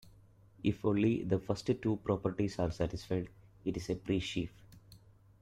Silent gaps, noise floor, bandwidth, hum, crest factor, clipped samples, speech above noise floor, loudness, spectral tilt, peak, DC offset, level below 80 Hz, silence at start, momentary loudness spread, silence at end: none; -61 dBFS; 14 kHz; none; 18 dB; under 0.1%; 27 dB; -35 LUFS; -7 dB/octave; -18 dBFS; under 0.1%; -56 dBFS; 0.05 s; 9 LU; 0.45 s